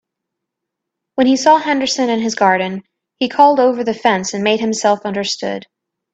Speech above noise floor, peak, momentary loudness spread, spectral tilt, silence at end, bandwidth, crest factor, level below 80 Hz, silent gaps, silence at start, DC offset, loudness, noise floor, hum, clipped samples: 65 dB; 0 dBFS; 12 LU; -3.5 dB/octave; 0.55 s; 8.8 kHz; 16 dB; -62 dBFS; none; 1.15 s; under 0.1%; -15 LUFS; -80 dBFS; none; under 0.1%